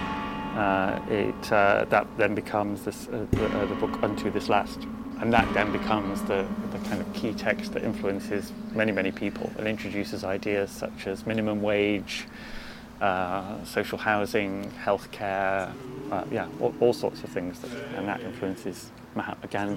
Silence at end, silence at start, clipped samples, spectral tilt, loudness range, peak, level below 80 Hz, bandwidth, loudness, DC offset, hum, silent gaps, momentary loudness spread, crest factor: 0 s; 0 s; under 0.1%; -6 dB/octave; 4 LU; -4 dBFS; -50 dBFS; 16.5 kHz; -28 LUFS; under 0.1%; none; none; 10 LU; 24 dB